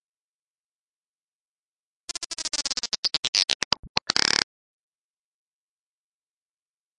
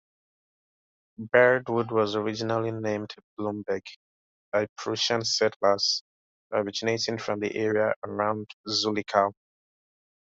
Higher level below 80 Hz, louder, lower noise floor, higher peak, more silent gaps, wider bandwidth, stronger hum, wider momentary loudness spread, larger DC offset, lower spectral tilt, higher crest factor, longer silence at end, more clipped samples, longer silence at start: first, -60 dBFS vs -70 dBFS; first, -24 LUFS vs -27 LUFS; about the same, under -90 dBFS vs under -90 dBFS; first, 0 dBFS vs -4 dBFS; second, 2.26-2.30 s, 2.98-3.03 s, 3.18-3.33 s, 3.55-3.71 s, 3.79-3.83 s, 3.89-3.95 s vs 3.23-3.37 s, 3.96-4.52 s, 4.69-4.76 s, 5.56-5.60 s, 6.01-6.50 s, 7.96-8.02 s, 8.53-8.64 s; first, 11.5 kHz vs 8 kHz; neither; about the same, 12 LU vs 10 LU; neither; second, 0.5 dB/octave vs -3.5 dB/octave; first, 30 dB vs 24 dB; first, 2.55 s vs 1.05 s; neither; first, 2.2 s vs 1.2 s